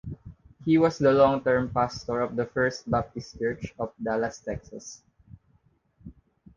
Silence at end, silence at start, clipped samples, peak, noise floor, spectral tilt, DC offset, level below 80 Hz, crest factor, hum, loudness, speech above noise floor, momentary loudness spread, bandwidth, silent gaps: 0.45 s; 0.05 s; under 0.1%; -6 dBFS; -65 dBFS; -6.5 dB/octave; under 0.1%; -52 dBFS; 20 dB; none; -26 LUFS; 40 dB; 18 LU; 7.6 kHz; none